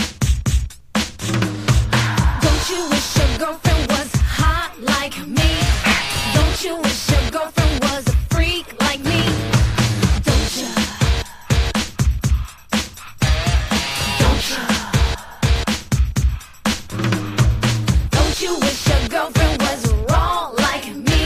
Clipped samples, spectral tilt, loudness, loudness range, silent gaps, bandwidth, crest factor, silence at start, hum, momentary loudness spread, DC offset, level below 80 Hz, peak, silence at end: under 0.1%; -4.5 dB/octave; -18 LUFS; 2 LU; none; 15.5 kHz; 16 dB; 0 s; none; 5 LU; under 0.1%; -22 dBFS; 0 dBFS; 0 s